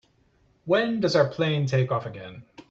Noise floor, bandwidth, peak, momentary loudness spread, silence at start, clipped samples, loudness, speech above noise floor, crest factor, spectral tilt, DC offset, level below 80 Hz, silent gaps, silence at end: -63 dBFS; 7.8 kHz; -8 dBFS; 19 LU; 0.65 s; under 0.1%; -24 LUFS; 39 dB; 18 dB; -6.5 dB/octave; under 0.1%; -62 dBFS; none; 0.1 s